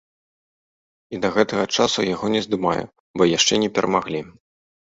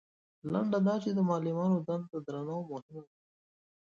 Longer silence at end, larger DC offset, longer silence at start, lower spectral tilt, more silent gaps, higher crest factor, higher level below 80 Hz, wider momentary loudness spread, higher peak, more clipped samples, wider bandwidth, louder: second, 0.55 s vs 0.95 s; neither; first, 1.1 s vs 0.45 s; second, -3.5 dB/octave vs -9 dB/octave; first, 3.00-3.14 s vs 2.82-2.89 s; about the same, 20 dB vs 16 dB; first, -56 dBFS vs -76 dBFS; second, 12 LU vs 15 LU; first, -2 dBFS vs -18 dBFS; neither; first, 8 kHz vs 7.2 kHz; first, -20 LUFS vs -33 LUFS